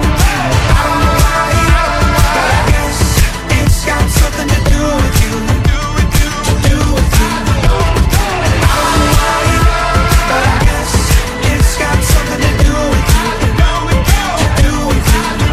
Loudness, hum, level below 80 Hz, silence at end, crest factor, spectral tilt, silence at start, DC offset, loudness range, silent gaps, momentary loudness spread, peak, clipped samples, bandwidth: -12 LUFS; none; -14 dBFS; 0 s; 10 dB; -4.5 dB/octave; 0 s; under 0.1%; 1 LU; none; 2 LU; 0 dBFS; 0.2%; 16 kHz